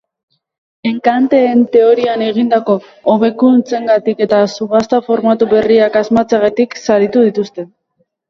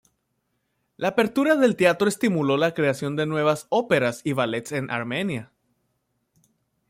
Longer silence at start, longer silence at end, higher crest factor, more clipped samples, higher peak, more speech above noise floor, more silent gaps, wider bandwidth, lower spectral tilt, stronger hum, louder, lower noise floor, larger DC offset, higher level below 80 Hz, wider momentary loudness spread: second, 0.85 s vs 1 s; second, 0.65 s vs 1.45 s; second, 12 dB vs 18 dB; neither; first, 0 dBFS vs -6 dBFS; about the same, 52 dB vs 52 dB; neither; second, 7.4 kHz vs 16 kHz; about the same, -6 dB/octave vs -5.5 dB/octave; neither; first, -12 LUFS vs -23 LUFS; second, -63 dBFS vs -74 dBFS; neither; first, -54 dBFS vs -66 dBFS; about the same, 6 LU vs 8 LU